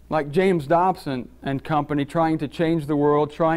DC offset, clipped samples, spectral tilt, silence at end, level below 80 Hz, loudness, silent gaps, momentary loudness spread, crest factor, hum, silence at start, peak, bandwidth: under 0.1%; under 0.1%; -8 dB/octave; 0 s; -50 dBFS; -22 LUFS; none; 10 LU; 14 dB; none; 0.1 s; -8 dBFS; 15.5 kHz